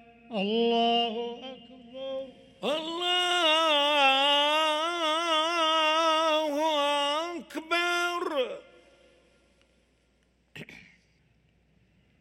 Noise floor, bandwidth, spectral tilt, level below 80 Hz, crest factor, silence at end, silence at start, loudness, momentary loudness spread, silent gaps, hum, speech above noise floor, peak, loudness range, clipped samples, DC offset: -68 dBFS; 16.5 kHz; -2 dB/octave; -72 dBFS; 18 dB; 1.4 s; 0.3 s; -25 LUFS; 19 LU; none; none; 41 dB; -12 dBFS; 9 LU; under 0.1%; under 0.1%